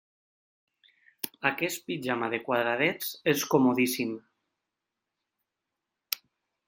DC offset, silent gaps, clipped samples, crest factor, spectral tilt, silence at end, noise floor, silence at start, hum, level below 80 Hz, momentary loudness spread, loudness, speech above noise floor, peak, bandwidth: under 0.1%; none; under 0.1%; 26 dB; -4 dB/octave; 0.5 s; -86 dBFS; 1.25 s; none; -76 dBFS; 11 LU; -28 LUFS; 59 dB; -4 dBFS; 16.5 kHz